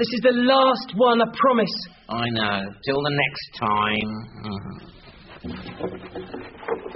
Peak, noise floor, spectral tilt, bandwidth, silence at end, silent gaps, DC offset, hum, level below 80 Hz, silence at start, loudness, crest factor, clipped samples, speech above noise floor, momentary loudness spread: -4 dBFS; -42 dBFS; -3 dB/octave; 6 kHz; 0 s; none; under 0.1%; none; -52 dBFS; 0 s; -22 LUFS; 18 dB; under 0.1%; 20 dB; 18 LU